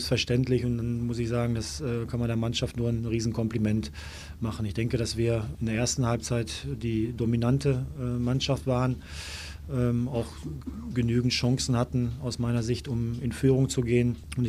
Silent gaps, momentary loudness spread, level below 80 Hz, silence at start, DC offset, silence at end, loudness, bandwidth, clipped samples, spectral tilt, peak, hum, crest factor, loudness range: none; 9 LU; -44 dBFS; 0 s; under 0.1%; 0 s; -28 LUFS; 14.5 kHz; under 0.1%; -6 dB/octave; -10 dBFS; none; 18 dB; 3 LU